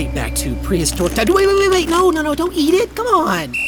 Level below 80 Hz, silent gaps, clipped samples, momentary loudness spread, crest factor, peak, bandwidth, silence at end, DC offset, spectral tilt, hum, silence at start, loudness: -28 dBFS; none; under 0.1%; 7 LU; 14 dB; -2 dBFS; over 20 kHz; 0 s; under 0.1%; -4.5 dB/octave; none; 0 s; -16 LUFS